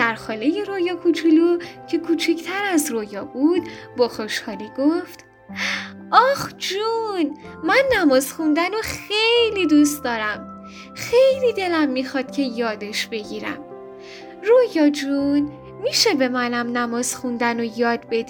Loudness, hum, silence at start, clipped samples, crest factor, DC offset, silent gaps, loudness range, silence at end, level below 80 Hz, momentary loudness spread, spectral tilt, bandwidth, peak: -20 LUFS; none; 0 s; under 0.1%; 20 dB; under 0.1%; none; 4 LU; 0 s; -58 dBFS; 13 LU; -3 dB/octave; over 20 kHz; 0 dBFS